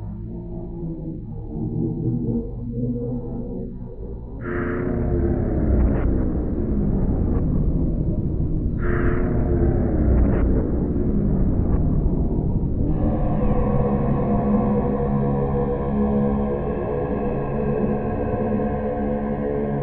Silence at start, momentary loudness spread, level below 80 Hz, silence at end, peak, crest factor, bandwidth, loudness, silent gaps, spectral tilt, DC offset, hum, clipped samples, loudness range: 0 s; 10 LU; -26 dBFS; 0 s; -6 dBFS; 14 dB; 3.4 kHz; -23 LUFS; none; -11 dB/octave; under 0.1%; none; under 0.1%; 6 LU